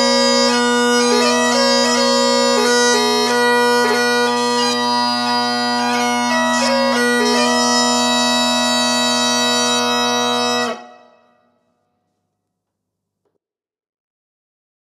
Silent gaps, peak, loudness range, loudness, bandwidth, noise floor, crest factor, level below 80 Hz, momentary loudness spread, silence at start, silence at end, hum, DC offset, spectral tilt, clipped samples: none; -2 dBFS; 6 LU; -14 LUFS; 15 kHz; -77 dBFS; 14 dB; -84 dBFS; 3 LU; 0 s; 4 s; none; under 0.1%; -1.5 dB/octave; under 0.1%